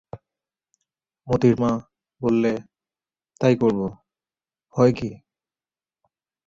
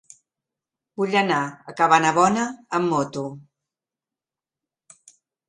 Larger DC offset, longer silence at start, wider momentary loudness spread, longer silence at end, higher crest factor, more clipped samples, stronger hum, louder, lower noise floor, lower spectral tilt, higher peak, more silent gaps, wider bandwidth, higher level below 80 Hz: neither; second, 0.15 s vs 1 s; second, 12 LU vs 15 LU; second, 1.3 s vs 2.1 s; about the same, 20 dB vs 24 dB; neither; neither; about the same, -22 LUFS vs -21 LUFS; about the same, under -90 dBFS vs -90 dBFS; first, -8 dB/octave vs -4.5 dB/octave; second, -4 dBFS vs 0 dBFS; neither; second, 7.6 kHz vs 11 kHz; first, -54 dBFS vs -68 dBFS